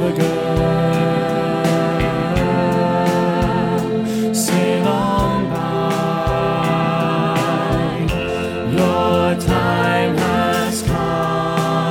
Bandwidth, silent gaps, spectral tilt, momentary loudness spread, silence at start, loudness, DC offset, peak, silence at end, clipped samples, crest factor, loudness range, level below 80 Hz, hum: 17 kHz; none; -6 dB/octave; 3 LU; 0 s; -17 LUFS; under 0.1%; -2 dBFS; 0 s; under 0.1%; 14 dB; 1 LU; -34 dBFS; none